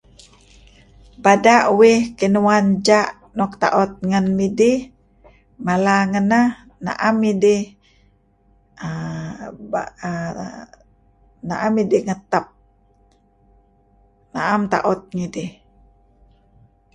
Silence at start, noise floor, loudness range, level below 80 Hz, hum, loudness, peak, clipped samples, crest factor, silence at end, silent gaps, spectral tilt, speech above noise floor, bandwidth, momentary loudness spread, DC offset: 1.2 s; -57 dBFS; 10 LU; -52 dBFS; none; -18 LUFS; 0 dBFS; under 0.1%; 20 dB; 1.45 s; none; -5.5 dB/octave; 40 dB; 11.5 kHz; 17 LU; under 0.1%